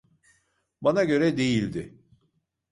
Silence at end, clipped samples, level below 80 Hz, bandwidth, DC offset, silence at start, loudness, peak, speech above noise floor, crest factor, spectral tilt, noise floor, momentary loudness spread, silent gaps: 0.85 s; under 0.1%; -58 dBFS; 11.5 kHz; under 0.1%; 0.8 s; -24 LUFS; -10 dBFS; 49 dB; 18 dB; -6 dB/octave; -73 dBFS; 13 LU; none